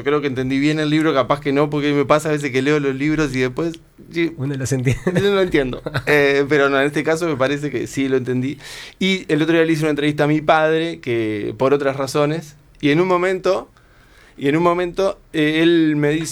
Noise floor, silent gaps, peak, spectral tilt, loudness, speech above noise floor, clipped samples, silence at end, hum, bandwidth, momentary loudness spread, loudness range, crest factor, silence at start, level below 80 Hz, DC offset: -49 dBFS; none; -2 dBFS; -6 dB/octave; -18 LUFS; 31 dB; under 0.1%; 0 s; none; 19.5 kHz; 8 LU; 2 LU; 16 dB; 0 s; -46 dBFS; under 0.1%